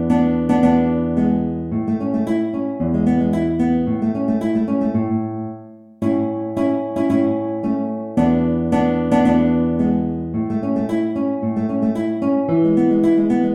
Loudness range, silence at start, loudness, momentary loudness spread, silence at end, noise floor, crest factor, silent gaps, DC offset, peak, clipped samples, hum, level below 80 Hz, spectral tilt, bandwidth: 3 LU; 0 s; -19 LUFS; 7 LU; 0 s; -38 dBFS; 16 dB; none; under 0.1%; -2 dBFS; under 0.1%; none; -42 dBFS; -9 dB/octave; 9.8 kHz